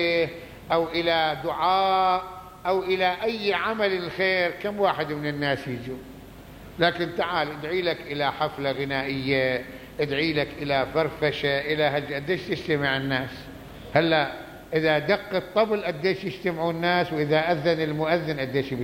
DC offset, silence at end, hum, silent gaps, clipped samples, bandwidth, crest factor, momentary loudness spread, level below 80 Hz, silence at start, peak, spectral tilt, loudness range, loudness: under 0.1%; 0 s; none; none; under 0.1%; 16.5 kHz; 20 dB; 8 LU; -54 dBFS; 0 s; -6 dBFS; -6 dB/octave; 3 LU; -25 LUFS